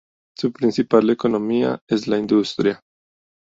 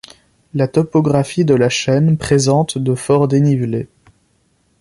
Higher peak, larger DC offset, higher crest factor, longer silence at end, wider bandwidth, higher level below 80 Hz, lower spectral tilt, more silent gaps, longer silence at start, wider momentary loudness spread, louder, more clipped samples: about the same, -2 dBFS vs 0 dBFS; neither; about the same, 18 dB vs 14 dB; second, 0.65 s vs 0.95 s; second, 7.8 kHz vs 11.5 kHz; second, -60 dBFS vs -48 dBFS; about the same, -6.5 dB/octave vs -6 dB/octave; first, 1.81-1.87 s vs none; second, 0.4 s vs 0.55 s; about the same, 8 LU vs 7 LU; second, -20 LUFS vs -15 LUFS; neither